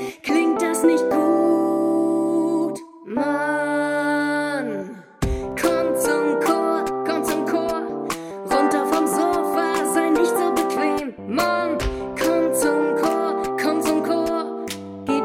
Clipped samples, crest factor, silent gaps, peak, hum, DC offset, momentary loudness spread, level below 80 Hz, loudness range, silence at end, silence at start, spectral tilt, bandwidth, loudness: under 0.1%; 16 dB; none; -6 dBFS; none; under 0.1%; 8 LU; -42 dBFS; 2 LU; 0 s; 0 s; -4.5 dB/octave; 17 kHz; -21 LUFS